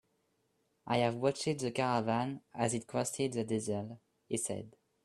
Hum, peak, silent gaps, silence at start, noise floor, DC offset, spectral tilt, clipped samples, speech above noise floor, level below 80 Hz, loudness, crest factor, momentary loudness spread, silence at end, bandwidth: none; -16 dBFS; none; 0.85 s; -77 dBFS; under 0.1%; -5 dB/octave; under 0.1%; 43 dB; -72 dBFS; -35 LUFS; 20 dB; 8 LU; 0.35 s; 13 kHz